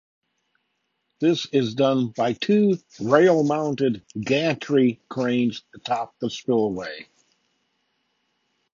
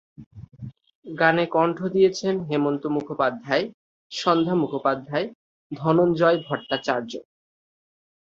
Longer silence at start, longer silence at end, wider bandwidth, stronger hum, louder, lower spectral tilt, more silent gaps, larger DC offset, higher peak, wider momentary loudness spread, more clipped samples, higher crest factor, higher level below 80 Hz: first, 1.2 s vs 0.2 s; first, 1.7 s vs 1.05 s; about the same, 7.4 kHz vs 7.6 kHz; neither; about the same, -22 LUFS vs -23 LUFS; about the same, -6.5 dB/octave vs -6 dB/octave; second, none vs 0.26-0.31 s, 0.95-1.02 s, 3.74-4.10 s, 5.35-5.70 s; neither; about the same, -2 dBFS vs -2 dBFS; second, 11 LU vs 17 LU; neither; about the same, 20 dB vs 22 dB; about the same, -66 dBFS vs -62 dBFS